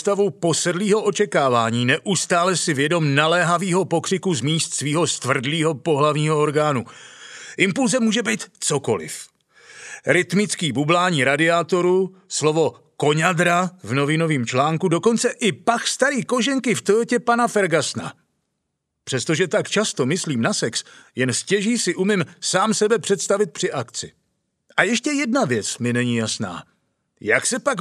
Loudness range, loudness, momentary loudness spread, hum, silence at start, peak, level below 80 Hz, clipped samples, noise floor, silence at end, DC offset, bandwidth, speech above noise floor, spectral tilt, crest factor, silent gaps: 3 LU; -20 LUFS; 8 LU; none; 0 s; 0 dBFS; -70 dBFS; under 0.1%; -77 dBFS; 0 s; under 0.1%; 13.5 kHz; 57 dB; -4 dB/octave; 20 dB; none